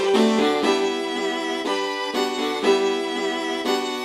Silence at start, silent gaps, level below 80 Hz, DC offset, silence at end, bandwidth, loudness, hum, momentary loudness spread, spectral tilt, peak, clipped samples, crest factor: 0 s; none; -66 dBFS; under 0.1%; 0 s; 13.5 kHz; -22 LUFS; none; 6 LU; -3.5 dB/octave; -6 dBFS; under 0.1%; 16 dB